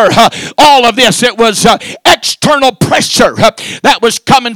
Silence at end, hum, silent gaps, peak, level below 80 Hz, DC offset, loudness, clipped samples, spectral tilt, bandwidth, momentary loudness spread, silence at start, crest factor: 0 s; none; none; 0 dBFS; -38 dBFS; 0.7%; -7 LUFS; 8%; -3 dB/octave; over 20 kHz; 5 LU; 0 s; 8 dB